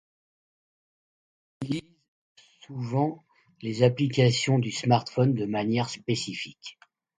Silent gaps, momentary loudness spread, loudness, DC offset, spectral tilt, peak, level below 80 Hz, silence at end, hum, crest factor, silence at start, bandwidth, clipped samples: 2.08-2.35 s; 16 LU; -26 LUFS; under 0.1%; -6 dB/octave; -6 dBFS; -66 dBFS; 0.5 s; none; 22 dB; 1.6 s; 9.4 kHz; under 0.1%